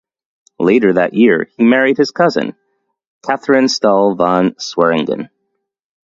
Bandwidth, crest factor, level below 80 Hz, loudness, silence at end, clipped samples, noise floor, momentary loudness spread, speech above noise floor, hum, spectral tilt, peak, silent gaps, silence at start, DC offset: 7.6 kHz; 14 dB; -58 dBFS; -13 LUFS; 0.8 s; under 0.1%; -71 dBFS; 10 LU; 58 dB; none; -5.5 dB/octave; 0 dBFS; 3.07-3.21 s; 0.6 s; under 0.1%